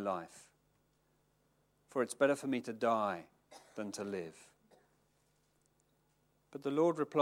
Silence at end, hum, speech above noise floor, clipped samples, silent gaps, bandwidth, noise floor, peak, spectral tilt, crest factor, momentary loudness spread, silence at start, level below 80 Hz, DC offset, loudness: 0 s; 50 Hz at -80 dBFS; 40 dB; under 0.1%; none; 16.5 kHz; -75 dBFS; -16 dBFS; -5.5 dB/octave; 24 dB; 16 LU; 0 s; -84 dBFS; under 0.1%; -36 LUFS